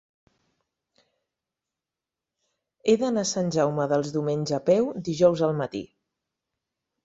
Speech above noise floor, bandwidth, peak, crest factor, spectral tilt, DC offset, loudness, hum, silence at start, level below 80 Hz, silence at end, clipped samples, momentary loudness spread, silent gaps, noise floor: 65 dB; 8 kHz; -8 dBFS; 20 dB; -5.5 dB/octave; under 0.1%; -24 LUFS; none; 2.85 s; -66 dBFS; 1.2 s; under 0.1%; 8 LU; none; -89 dBFS